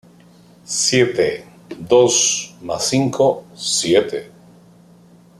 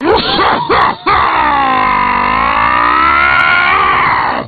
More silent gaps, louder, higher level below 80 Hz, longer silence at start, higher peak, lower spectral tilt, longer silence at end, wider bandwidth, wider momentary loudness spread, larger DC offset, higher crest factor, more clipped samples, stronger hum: neither; second, -17 LUFS vs -9 LUFS; second, -58 dBFS vs -32 dBFS; first, 0.7 s vs 0 s; about the same, -2 dBFS vs 0 dBFS; second, -3 dB/octave vs -6.5 dB/octave; first, 1.1 s vs 0 s; first, 14 kHz vs 5.2 kHz; first, 14 LU vs 3 LU; neither; first, 18 dB vs 10 dB; neither; first, 60 Hz at -50 dBFS vs none